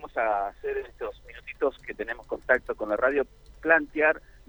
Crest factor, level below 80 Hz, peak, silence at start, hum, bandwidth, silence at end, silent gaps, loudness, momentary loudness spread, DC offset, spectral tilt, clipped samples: 22 dB; -52 dBFS; -6 dBFS; 0 s; none; 19.5 kHz; 0.3 s; none; -27 LUFS; 15 LU; under 0.1%; -6 dB/octave; under 0.1%